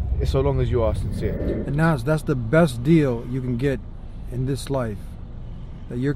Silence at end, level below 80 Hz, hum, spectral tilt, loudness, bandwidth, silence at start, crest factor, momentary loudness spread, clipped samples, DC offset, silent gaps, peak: 0 s; -32 dBFS; none; -7.5 dB/octave; -23 LUFS; 14 kHz; 0 s; 16 dB; 19 LU; under 0.1%; under 0.1%; none; -6 dBFS